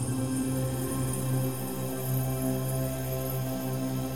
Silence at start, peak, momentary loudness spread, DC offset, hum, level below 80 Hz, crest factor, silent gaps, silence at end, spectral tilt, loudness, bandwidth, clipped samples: 0 s; -18 dBFS; 3 LU; 0.6%; none; -48 dBFS; 12 dB; none; 0 s; -6 dB/octave; -31 LUFS; 17.5 kHz; under 0.1%